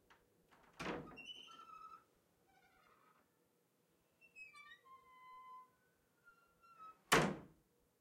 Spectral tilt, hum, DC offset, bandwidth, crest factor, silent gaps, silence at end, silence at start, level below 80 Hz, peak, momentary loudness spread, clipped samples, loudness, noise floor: -3.5 dB/octave; none; under 0.1%; 16 kHz; 30 dB; none; 0.55 s; 0.8 s; -72 dBFS; -18 dBFS; 27 LU; under 0.1%; -40 LUFS; -79 dBFS